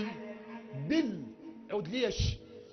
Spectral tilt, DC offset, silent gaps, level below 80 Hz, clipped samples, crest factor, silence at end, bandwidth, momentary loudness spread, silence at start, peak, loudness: -5.5 dB/octave; under 0.1%; none; -46 dBFS; under 0.1%; 18 dB; 0 s; 6.6 kHz; 15 LU; 0 s; -18 dBFS; -35 LUFS